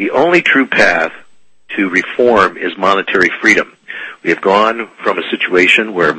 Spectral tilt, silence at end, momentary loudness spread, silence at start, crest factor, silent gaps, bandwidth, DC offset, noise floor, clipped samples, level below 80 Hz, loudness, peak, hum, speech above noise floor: -4 dB/octave; 0 s; 10 LU; 0 s; 12 dB; none; 11 kHz; under 0.1%; -49 dBFS; 0.2%; -52 dBFS; -12 LUFS; 0 dBFS; none; 37 dB